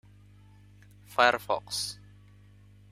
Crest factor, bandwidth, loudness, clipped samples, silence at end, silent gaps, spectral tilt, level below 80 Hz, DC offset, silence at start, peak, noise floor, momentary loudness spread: 28 dB; 16 kHz; -28 LUFS; under 0.1%; 1 s; none; -2 dB/octave; -62 dBFS; under 0.1%; 1.1 s; -6 dBFS; -55 dBFS; 12 LU